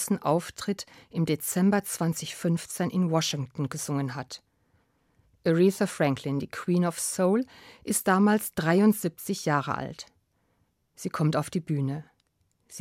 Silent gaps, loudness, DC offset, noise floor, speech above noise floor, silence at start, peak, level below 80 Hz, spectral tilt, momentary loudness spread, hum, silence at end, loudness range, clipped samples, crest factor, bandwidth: none; -27 LUFS; under 0.1%; -72 dBFS; 45 dB; 0 s; -10 dBFS; -66 dBFS; -5.5 dB/octave; 14 LU; none; 0 s; 5 LU; under 0.1%; 18 dB; 16.5 kHz